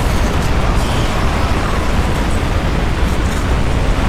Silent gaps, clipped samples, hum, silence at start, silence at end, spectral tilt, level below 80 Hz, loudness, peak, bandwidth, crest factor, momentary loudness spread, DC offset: none; under 0.1%; none; 0 s; 0 s; -5.5 dB/octave; -16 dBFS; -17 LUFS; -2 dBFS; 15.5 kHz; 12 dB; 1 LU; 2%